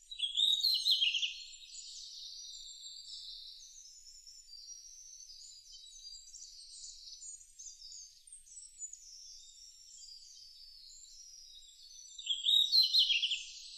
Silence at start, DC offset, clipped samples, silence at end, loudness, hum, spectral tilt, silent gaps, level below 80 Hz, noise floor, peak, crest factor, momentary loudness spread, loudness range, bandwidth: 0.1 s; under 0.1%; under 0.1%; 0 s; -29 LUFS; none; 7 dB/octave; none; -70 dBFS; -57 dBFS; -16 dBFS; 22 dB; 25 LU; 19 LU; 14 kHz